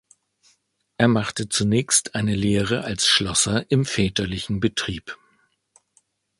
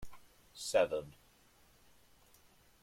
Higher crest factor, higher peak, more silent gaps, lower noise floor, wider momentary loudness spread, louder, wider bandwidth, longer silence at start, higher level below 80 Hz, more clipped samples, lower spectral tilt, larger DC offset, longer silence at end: about the same, 22 dB vs 22 dB; first, 0 dBFS vs -18 dBFS; neither; about the same, -66 dBFS vs -66 dBFS; second, 9 LU vs 25 LU; first, -21 LUFS vs -35 LUFS; second, 11.5 kHz vs 16.5 kHz; first, 1 s vs 0 s; first, -46 dBFS vs -66 dBFS; neither; about the same, -3.5 dB/octave vs -3 dB/octave; neither; second, 1.25 s vs 1.7 s